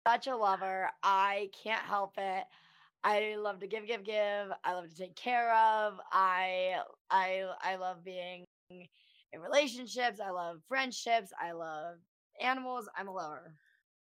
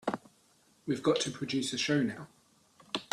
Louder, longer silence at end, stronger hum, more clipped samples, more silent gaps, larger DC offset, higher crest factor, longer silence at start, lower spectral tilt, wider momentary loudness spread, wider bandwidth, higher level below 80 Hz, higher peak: about the same, -34 LUFS vs -32 LUFS; first, 0.5 s vs 0.05 s; neither; neither; first, 7.01-7.05 s, 8.47-8.67 s, 12.08-12.30 s vs none; neither; about the same, 20 dB vs 20 dB; about the same, 0.05 s vs 0.05 s; second, -2.5 dB/octave vs -4 dB/octave; about the same, 14 LU vs 16 LU; first, 16 kHz vs 13 kHz; second, under -90 dBFS vs -72 dBFS; about the same, -16 dBFS vs -14 dBFS